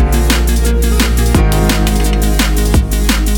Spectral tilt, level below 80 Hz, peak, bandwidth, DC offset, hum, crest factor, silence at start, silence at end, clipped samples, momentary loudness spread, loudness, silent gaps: -5 dB/octave; -12 dBFS; 0 dBFS; 19 kHz; under 0.1%; none; 10 dB; 0 s; 0 s; under 0.1%; 2 LU; -13 LUFS; none